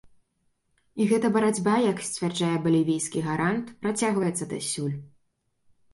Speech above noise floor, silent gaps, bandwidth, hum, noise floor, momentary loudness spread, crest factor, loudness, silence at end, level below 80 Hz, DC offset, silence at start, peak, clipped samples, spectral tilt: 47 dB; none; 11.5 kHz; none; -72 dBFS; 7 LU; 16 dB; -26 LUFS; 0.85 s; -66 dBFS; under 0.1%; 0.95 s; -10 dBFS; under 0.1%; -5 dB/octave